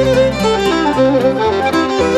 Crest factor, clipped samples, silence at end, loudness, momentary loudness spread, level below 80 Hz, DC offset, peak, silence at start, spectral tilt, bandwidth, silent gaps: 12 dB; under 0.1%; 0 s; -13 LUFS; 2 LU; -34 dBFS; under 0.1%; -2 dBFS; 0 s; -5.5 dB/octave; 14 kHz; none